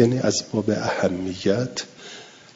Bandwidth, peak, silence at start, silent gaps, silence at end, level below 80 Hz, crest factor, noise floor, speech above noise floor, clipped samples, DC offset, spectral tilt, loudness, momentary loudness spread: 7.8 kHz; -4 dBFS; 0 s; none; 0.25 s; -60 dBFS; 20 dB; -42 dBFS; 20 dB; under 0.1%; under 0.1%; -5 dB/octave; -23 LUFS; 17 LU